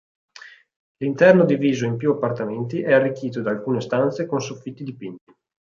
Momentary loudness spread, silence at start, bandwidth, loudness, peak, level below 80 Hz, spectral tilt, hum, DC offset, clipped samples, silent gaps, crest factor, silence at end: 18 LU; 0.45 s; 7.4 kHz; -20 LUFS; -2 dBFS; -66 dBFS; -7 dB/octave; none; under 0.1%; under 0.1%; 0.76-0.95 s; 20 dB; 0.45 s